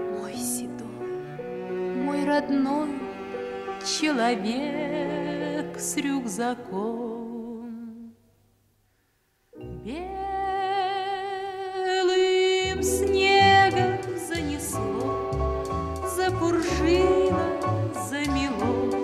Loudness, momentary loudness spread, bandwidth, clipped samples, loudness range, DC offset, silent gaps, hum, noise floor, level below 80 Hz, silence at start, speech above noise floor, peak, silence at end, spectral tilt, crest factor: -26 LUFS; 14 LU; 14 kHz; under 0.1%; 12 LU; under 0.1%; none; none; -68 dBFS; -44 dBFS; 0 s; 42 dB; -8 dBFS; 0 s; -4.5 dB/octave; 18 dB